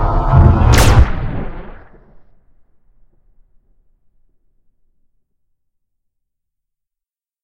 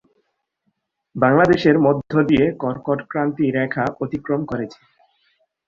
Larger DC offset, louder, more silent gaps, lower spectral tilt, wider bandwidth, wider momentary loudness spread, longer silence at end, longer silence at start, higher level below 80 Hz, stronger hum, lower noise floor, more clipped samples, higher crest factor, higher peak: neither; first, -12 LUFS vs -19 LUFS; neither; second, -6 dB/octave vs -8 dB/octave; first, 16 kHz vs 7.2 kHz; first, 19 LU vs 13 LU; first, 5.65 s vs 1 s; second, 0 s vs 1.15 s; first, -20 dBFS vs -50 dBFS; neither; first, -86 dBFS vs -72 dBFS; first, 0.1% vs under 0.1%; about the same, 16 dB vs 18 dB; about the same, 0 dBFS vs -2 dBFS